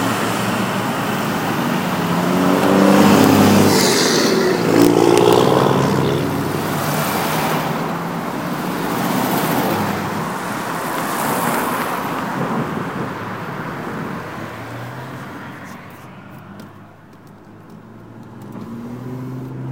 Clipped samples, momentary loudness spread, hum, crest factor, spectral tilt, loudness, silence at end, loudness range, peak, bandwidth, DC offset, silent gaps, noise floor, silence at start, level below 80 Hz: under 0.1%; 20 LU; none; 18 dB; -5 dB/octave; -17 LUFS; 0 s; 21 LU; 0 dBFS; 16 kHz; 0.1%; none; -42 dBFS; 0 s; -50 dBFS